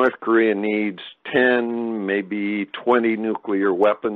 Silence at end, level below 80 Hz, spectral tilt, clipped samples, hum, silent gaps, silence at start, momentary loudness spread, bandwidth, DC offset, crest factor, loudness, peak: 0 s; -66 dBFS; -8 dB/octave; under 0.1%; none; none; 0 s; 7 LU; 4.5 kHz; under 0.1%; 16 dB; -21 LUFS; -4 dBFS